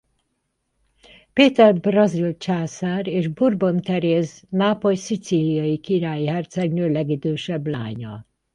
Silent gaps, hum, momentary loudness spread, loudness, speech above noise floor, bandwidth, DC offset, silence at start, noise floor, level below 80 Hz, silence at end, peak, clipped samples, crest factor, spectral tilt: none; none; 10 LU; -21 LUFS; 53 dB; 10.5 kHz; under 0.1%; 1.35 s; -73 dBFS; -60 dBFS; 0.35 s; -2 dBFS; under 0.1%; 20 dB; -6.5 dB/octave